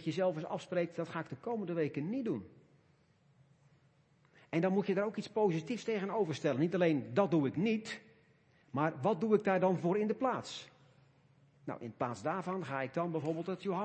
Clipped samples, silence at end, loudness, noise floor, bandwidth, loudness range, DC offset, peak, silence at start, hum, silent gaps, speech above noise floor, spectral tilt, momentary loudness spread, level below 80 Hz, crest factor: under 0.1%; 0 s; -35 LUFS; -69 dBFS; 8.4 kHz; 7 LU; under 0.1%; -16 dBFS; 0 s; none; none; 35 dB; -7 dB/octave; 10 LU; -80 dBFS; 20 dB